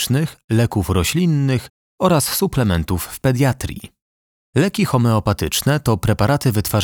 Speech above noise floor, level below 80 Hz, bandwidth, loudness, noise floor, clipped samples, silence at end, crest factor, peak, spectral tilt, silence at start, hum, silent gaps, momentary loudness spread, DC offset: over 73 dB; -36 dBFS; over 20 kHz; -18 LUFS; under -90 dBFS; under 0.1%; 0 s; 16 dB; -2 dBFS; -5.5 dB/octave; 0 s; none; 0.44-0.48 s, 1.70-1.98 s, 4.02-4.53 s; 5 LU; under 0.1%